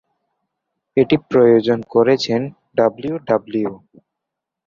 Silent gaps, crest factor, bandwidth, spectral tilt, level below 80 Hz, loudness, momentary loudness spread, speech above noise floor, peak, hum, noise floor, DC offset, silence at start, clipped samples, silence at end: none; 16 dB; 7.4 kHz; -6.5 dB/octave; -56 dBFS; -17 LUFS; 10 LU; 66 dB; -2 dBFS; none; -82 dBFS; under 0.1%; 0.95 s; under 0.1%; 0.9 s